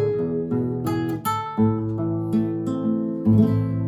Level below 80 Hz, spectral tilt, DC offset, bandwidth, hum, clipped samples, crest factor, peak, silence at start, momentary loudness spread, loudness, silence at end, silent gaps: -50 dBFS; -8.5 dB/octave; under 0.1%; 19 kHz; none; under 0.1%; 16 dB; -4 dBFS; 0 s; 7 LU; -23 LUFS; 0 s; none